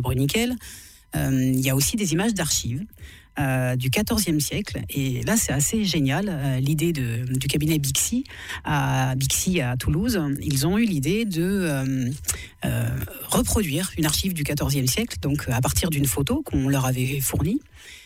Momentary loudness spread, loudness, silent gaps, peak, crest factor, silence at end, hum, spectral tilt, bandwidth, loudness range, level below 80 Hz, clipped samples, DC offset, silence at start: 7 LU; -23 LUFS; none; -10 dBFS; 14 dB; 0 s; none; -4.5 dB/octave; 16.5 kHz; 1 LU; -38 dBFS; under 0.1%; under 0.1%; 0 s